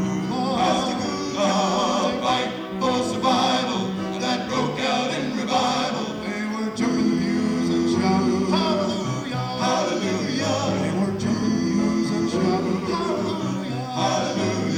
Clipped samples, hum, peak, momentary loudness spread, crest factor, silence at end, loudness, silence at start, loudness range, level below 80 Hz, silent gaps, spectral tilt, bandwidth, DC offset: under 0.1%; none; -8 dBFS; 6 LU; 14 dB; 0 s; -23 LUFS; 0 s; 1 LU; -54 dBFS; none; -5 dB/octave; 13 kHz; under 0.1%